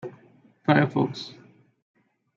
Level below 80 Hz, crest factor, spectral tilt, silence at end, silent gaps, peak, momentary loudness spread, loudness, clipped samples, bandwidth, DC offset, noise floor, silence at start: -70 dBFS; 24 dB; -7.5 dB/octave; 1.05 s; none; -4 dBFS; 20 LU; -24 LUFS; under 0.1%; 7.4 kHz; under 0.1%; -57 dBFS; 0.05 s